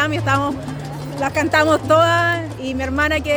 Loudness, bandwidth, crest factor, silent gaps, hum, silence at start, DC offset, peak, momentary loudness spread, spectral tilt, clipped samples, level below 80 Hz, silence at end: -17 LUFS; over 20 kHz; 14 dB; none; none; 0 s; under 0.1%; -4 dBFS; 13 LU; -5 dB/octave; under 0.1%; -42 dBFS; 0 s